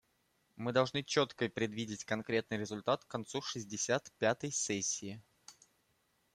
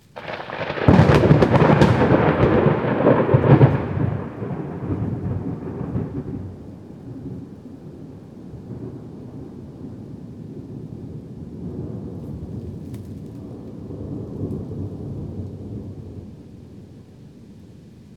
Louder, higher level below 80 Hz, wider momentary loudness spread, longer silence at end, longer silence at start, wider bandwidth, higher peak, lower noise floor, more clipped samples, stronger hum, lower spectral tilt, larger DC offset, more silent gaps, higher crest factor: second, -36 LUFS vs -19 LUFS; second, -74 dBFS vs -40 dBFS; second, 8 LU vs 24 LU; first, 0.85 s vs 0 s; first, 0.55 s vs 0.15 s; first, 14 kHz vs 8.8 kHz; second, -16 dBFS vs 0 dBFS; first, -77 dBFS vs -44 dBFS; neither; neither; second, -3.5 dB/octave vs -8.5 dB/octave; neither; neither; about the same, 22 dB vs 22 dB